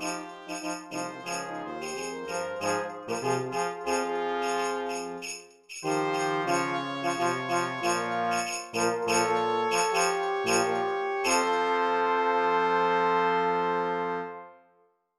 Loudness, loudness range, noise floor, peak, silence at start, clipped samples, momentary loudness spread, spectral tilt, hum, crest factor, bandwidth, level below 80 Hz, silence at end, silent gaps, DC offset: -28 LUFS; 6 LU; -66 dBFS; -10 dBFS; 0 s; under 0.1%; 10 LU; -3 dB/octave; none; 18 dB; 15 kHz; -76 dBFS; 0.65 s; none; under 0.1%